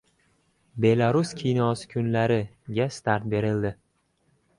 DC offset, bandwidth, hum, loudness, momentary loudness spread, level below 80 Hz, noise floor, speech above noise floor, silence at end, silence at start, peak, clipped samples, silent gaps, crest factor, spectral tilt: under 0.1%; 11 kHz; none; -25 LUFS; 7 LU; -56 dBFS; -69 dBFS; 45 dB; 0.85 s; 0.75 s; -8 dBFS; under 0.1%; none; 18 dB; -7 dB/octave